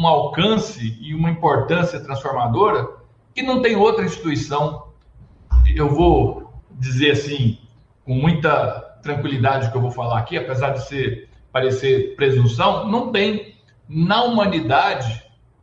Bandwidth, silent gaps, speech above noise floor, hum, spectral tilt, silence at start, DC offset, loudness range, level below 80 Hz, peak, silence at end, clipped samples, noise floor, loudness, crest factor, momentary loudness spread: 7.6 kHz; none; 29 dB; none; -6.5 dB/octave; 0 s; under 0.1%; 2 LU; -30 dBFS; -4 dBFS; 0.4 s; under 0.1%; -47 dBFS; -19 LUFS; 16 dB; 11 LU